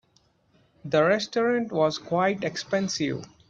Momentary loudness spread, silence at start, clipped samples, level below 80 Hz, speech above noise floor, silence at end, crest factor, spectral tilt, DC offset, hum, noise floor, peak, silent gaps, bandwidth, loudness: 7 LU; 0.85 s; under 0.1%; -66 dBFS; 40 dB; 0.25 s; 18 dB; -5 dB/octave; under 0.1%; none; -65 dBFS; -8 dBFS; none; 8 kHz; -25 LUFS